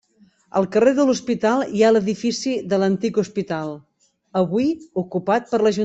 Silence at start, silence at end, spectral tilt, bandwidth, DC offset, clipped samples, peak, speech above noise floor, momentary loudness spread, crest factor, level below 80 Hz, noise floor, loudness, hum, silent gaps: 0.55 s; 0 s; -6 dB/octave; 8.2 kHz; under 0.1%; under 0.1%; -4 dBFS; 37 dB; 10 LU; 16 dB; -60 dBFS; -57 dBFS; -20 LUFS; none; none